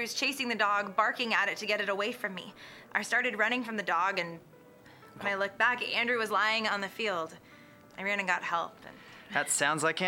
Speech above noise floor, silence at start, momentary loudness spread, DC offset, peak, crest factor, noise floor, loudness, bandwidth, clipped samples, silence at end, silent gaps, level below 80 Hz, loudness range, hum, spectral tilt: 24 dB; 0 s; 14 LU; under 0.1%; -12 dBFS; 20 dB; -55 dBFS; -30 LUFS; 18 kHz; under 0.1%; 0 s; none; -78 dBFS; 2 LU; none; -2 dB/octave